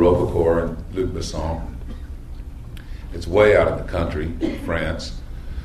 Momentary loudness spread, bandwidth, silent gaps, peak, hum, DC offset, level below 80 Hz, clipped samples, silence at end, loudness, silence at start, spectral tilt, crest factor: 21 LU; 13.5 kHz; none; -2 dBFS; none; under 0.1%; -32 dBFS; under 0.1%; 0 s; -21 LUFS; 0 s; -6.5 dB/octave; 20 dB